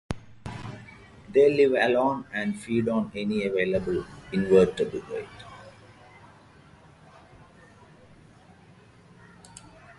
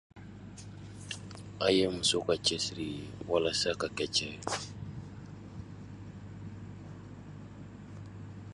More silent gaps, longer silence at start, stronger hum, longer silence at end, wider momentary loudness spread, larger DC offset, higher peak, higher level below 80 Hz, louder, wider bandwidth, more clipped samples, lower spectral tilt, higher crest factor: neither; about the same, 0.1 s vs 0.15 s; neither; about the same, 0.05 s vs 0 s; first, 25 LU vs 20 LU; neither; first, -8 dBFS vs -12 dBFS; about the same, -54 dBFS vs -58 dBFS; first, -25 LUFS vs -32 LUFS; about the same, 11.5 kHz vs 11.5 kHz; neither; first, -6.5 dB/octave vs -3.5 dB/octave; about the same, 20 dB vs 24 dB